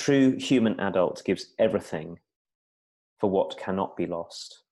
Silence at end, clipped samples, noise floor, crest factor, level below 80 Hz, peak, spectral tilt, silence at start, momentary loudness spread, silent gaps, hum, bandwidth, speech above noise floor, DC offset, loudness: 0.15 s; under 0.1%; under -90 dBFS; 16 dB; -64 dBFS; -10 dBFS; -6 dB/octave; 0 s; 14 LU; 2.36-2.45 s, 2.55-3.16 s; none; 11.5 kHz; over 64 dB; under 0.1%; -26 LUFS